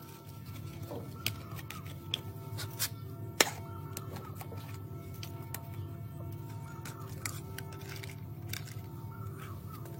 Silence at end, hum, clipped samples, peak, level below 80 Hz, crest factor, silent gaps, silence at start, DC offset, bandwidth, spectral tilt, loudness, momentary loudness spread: 0 s; none; under 0.1%; -2 dBFS; -62 dBFS; 38 dB; none; 0 s; under 0.1%; 16.5 kHz; -3.5 dB/octave; -40 LUFS; 9 LU